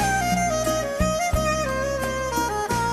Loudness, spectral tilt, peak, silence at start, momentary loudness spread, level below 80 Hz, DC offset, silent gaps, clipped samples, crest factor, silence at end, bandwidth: -23 LUFS; -4 dB/octave; -8 dBFS; 0 s; 3 LU; -34 dBFS; under 0.1%; none; under 0.1%; 14 dB; 0 s; 15.5 kHz